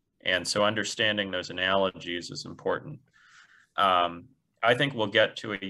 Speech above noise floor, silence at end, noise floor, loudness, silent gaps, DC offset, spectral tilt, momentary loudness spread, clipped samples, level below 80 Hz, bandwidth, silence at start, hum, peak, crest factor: 30 dB; 0 s; -57 dBFS; -27 LUFS; none; under 0.1%; -3.5 dB/octave; 11 LU; under 0.1%; -68 dBFS; 12.5 kHz; 0.25 s; none; -10 dBFS; 20 dB